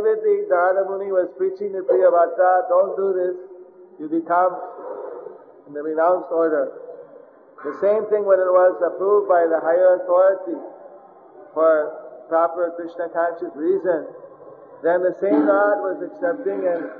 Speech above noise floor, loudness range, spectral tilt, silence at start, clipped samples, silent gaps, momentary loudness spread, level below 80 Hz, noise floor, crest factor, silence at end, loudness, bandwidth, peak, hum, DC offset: 27 dB; 6 LU; -9.5 dB/octave; 0 s; under 0.1%; none; 16 LU; -80 dBFS; -46 dBFS; 16 dB; 0 s; -20 LUFS; 3.8 kHz; -4 dBFS; none; under 0.1%